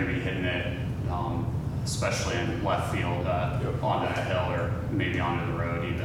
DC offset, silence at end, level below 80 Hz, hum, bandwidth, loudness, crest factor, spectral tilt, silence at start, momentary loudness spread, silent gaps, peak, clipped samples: under 0.1%; 0 s; -42 dBFS; none; 15.5 kHz; -29 LUFS; 16 dB; -6 dB/octave; 0 s; 3 LU; none; -12 dBFS; under 0.1%